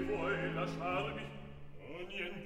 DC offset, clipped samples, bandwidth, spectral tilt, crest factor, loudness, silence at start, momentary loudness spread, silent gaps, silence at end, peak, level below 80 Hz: 0.1%; under 0.1%; 12 kHz; -6.5 dB/octave; 16 dB; -39 LUFS; 0 s; 15 LU; none; 0 s; -24 dBFS; -56 dBFS